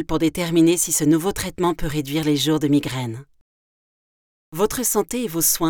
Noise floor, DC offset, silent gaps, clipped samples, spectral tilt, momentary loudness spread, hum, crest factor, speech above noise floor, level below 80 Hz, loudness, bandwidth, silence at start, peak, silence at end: under -90 dBFS; under 0.1%; 3.41-4.52 s; under 0.1%; -4 dB/octave; 10 LU; none; 16 dB; over 70 dB; -42 dBFS; -20 LUFS; over 20 kHz; 0 s; -6 dBFS; 0 s